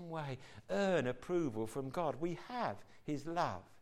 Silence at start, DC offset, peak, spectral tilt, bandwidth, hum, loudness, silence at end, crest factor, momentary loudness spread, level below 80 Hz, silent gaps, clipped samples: 0 s; under 0.1%; -22 dBFS; -6.5 dB/octave; 14.5 kHz; none; -39 LUFS; 0 s; 18 dB; 9 LU; -64 dBFS; none; under 0.1%